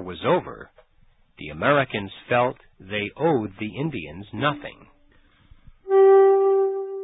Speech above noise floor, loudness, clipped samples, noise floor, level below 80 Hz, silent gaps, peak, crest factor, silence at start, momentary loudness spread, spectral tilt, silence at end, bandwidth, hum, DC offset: 33 dB; -21 LUFS; under 0.1%; -58 dBFS; -54 dBFS; none; -6 dBFS; 16 dB; 0 s; 22 LU; -11 dB/octave; 0 s; 4 kHz; none; under 0.1%